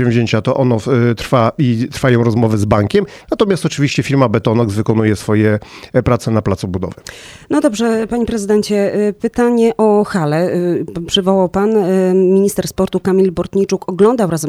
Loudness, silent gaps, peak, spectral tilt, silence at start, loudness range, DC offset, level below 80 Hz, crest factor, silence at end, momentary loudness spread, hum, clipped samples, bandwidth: -14 LUFS; none; 0 dBFS; -6.5 dB/octave; 0 s; 3 LU; under 0.1%; -40 dBFS; 14 dB; 0 s; 6 LU; none; under 0.1%; 15 kHz